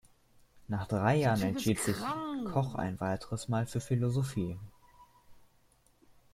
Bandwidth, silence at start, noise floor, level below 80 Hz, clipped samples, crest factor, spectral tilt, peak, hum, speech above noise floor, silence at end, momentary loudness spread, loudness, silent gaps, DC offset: 16 kHz; 0.55 s; -67 dBFS; -60 dBFS; under 0.1%; 20 dB; -6 dB/octave; -12 dBFS; none; 35 dB; 0.95 s; 10 LU; -33 LUFS; none; under 0.1%